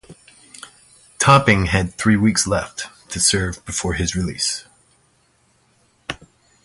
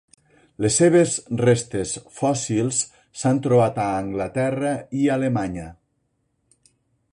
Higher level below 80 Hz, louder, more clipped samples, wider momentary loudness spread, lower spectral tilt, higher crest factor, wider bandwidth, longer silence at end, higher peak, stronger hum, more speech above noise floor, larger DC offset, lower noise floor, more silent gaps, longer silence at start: first, -38 dBFS vs -52 dBFS; first, -18 LUFS vs -21 LUFS; neither; first, 21 LU vs 10 LU; second, -4 dB/octave vs -5.5 dB/octave; about the same, 20 dB vs 16 dB; about the same, 11.5 kHz vs 11.5 kHz; second, 0.5 s vs 1.4 s; first, 0 dBFS vs -6 dBFS; neither; second, 42 dB vs 50 dB; neither; second, -60 dBFS vs -71 dBFS; neither; second, 0.1 s vs 0.6 s